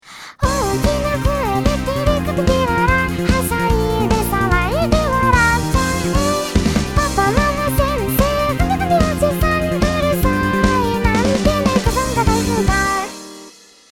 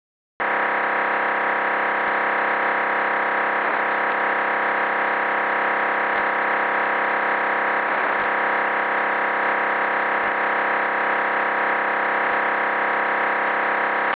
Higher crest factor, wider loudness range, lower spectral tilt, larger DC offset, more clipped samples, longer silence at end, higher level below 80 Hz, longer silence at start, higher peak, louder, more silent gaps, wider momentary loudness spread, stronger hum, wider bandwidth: about the same, 16 dB vs 12 dB; about the same, 1 LU vs 0 LU; first, -5.5 dB/octave vs -0.5 dB/octave; first, 0.1% vs under 0.1%; neither; first, 0.45 s vs 0 s; first, -24 dBFS vs -70 dBFS; second, 0.05 s vs 0.4 s; first, 0 dBFS vs -10 dBFS; first, -17 LUFS vs -20 LUFS; neither; first, 3 LU vs 0 LU; neither; first, 19.5 kHz vs 4 kHz